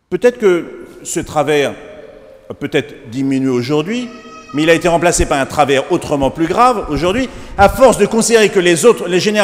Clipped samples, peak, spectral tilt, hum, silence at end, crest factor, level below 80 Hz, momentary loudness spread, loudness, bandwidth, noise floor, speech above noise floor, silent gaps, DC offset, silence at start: 0.2%; 0 dBFS; -4.5 dB/octave; none; 0 s; 14 dB; -34 dBFS; 13 LU; -13 LUFS; 16.5 kHz; -37 dBFS; 24 dB; none; under 0.1%; 0.1 s